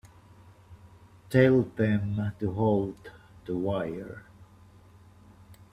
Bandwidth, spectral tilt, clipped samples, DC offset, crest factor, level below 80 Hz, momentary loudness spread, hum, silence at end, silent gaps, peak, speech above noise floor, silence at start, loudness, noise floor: 14.5 kHz; -8.5 dB/octave; under 0.1%; under 0.1%; 22 dB; -58 dBFS; 24 LU; none; 0.2 s; none; -8 dBFS; 28 dB; 0.7 s; -27 LUFS; -54 dBFS